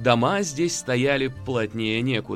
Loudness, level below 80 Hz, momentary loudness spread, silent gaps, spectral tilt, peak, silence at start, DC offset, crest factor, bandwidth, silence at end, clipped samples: -23 LUFS; -52 dBFS; 6 LU; none; -4.5 dB/octave; -4 dBFS; 0 s; under 0.1%; 18 dB; 15 kHz; 0 s; under 0.1%